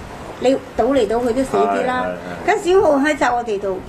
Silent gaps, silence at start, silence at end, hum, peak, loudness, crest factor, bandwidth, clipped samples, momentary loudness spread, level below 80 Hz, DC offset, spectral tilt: none; 0 s; 0 s; none; -4 dBFS; -18 LUFS; 14 dB; 14 kHz; under 0.1%; 8 LU; -42 dBFS; under 0.1%; -5 dB/octave